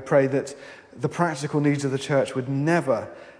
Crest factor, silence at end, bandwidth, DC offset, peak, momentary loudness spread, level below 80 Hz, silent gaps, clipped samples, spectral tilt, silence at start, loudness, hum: 18 dB; 0.1 s; 10.5 kHz; under 0.1%; -6 dBFS; 10 LU; -68 dBFS; none; under 0.1%; -6.5 dB/octave; 0 s; -24 LUFS; none